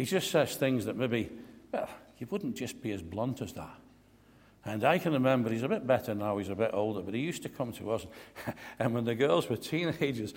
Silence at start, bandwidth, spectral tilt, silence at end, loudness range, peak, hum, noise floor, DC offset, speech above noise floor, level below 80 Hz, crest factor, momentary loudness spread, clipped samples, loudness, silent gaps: 0 s; 16.5 kHz; -5.5 dB/octave; 0 s; 7 LU; -12 dBFS; none; -60 dBFS; under 0.1%; 29 dB; -64 dBFS; 20 dB; 14 LU; under 0.1%; -32 LUFS; none